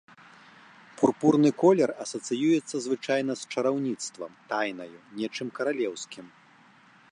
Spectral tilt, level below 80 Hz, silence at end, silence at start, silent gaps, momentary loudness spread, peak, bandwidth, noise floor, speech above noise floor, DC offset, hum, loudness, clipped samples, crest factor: -5 dB/octave; -76 dBFS; 0.85 s; 1 s; none; 16 LU; -6 dBFS; 11 kHz; -57 dBFS; 30 dB; under 0.1%; none; -27 LUFS; under 0.1%; 20 dB